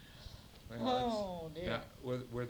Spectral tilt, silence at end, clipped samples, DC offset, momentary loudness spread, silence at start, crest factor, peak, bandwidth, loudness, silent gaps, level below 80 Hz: -6 dB/octave; 0 s; under 0.1%; under 0.1%; 18 LU; 0 s; 18 dB; -22 dBFS; over 20 kHz; -39 LUFS; none; -58 dBFS